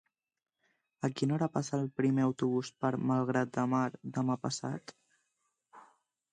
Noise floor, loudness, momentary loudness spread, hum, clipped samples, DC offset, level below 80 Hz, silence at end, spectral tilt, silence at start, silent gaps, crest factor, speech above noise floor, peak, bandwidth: -81 dBFS; -33 LUFS; 7 LU; none; under 0.1%; under 0.1%; -76 dBFS; 0.5 s; -6.5 dB/octave; 1 s; none; 18 dB; 49 dB; -16 dBFS; 9.8 kHz